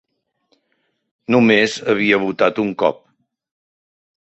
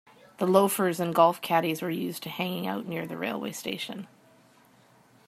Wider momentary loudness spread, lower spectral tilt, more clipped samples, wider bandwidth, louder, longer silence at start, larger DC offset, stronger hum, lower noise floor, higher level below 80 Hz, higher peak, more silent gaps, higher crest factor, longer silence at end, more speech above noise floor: second, 7 LU vs 12 LU; about the same, -5 dB/octave vs -5 dB/octave; neither; second, 8.2 kHz vs 16 kHz; first, -16 LUFS vs -27 LUFS; first, 1.3 s vs 0.4 s; neither; neither; first, -68 dBFS vs -59 dBFS; first, -60 dBFS vs -76 dBFS; first, -2 dBFS vs -6 dBFS; neither; second, 18 dB vs 24 dB; first, 1.4 s vs 1.2 s; first, 53 dB vs 32 dB